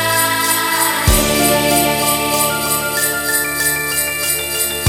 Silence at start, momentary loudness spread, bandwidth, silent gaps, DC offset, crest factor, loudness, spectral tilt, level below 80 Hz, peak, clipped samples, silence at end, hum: 0 s; 3 LU; over 20 kHz; none; under 0.1%; 16 dB; -14 LUFS; -2.5 dB/octave; -30 dBFS; 0 dBFS; under 0.1%; 0 s; none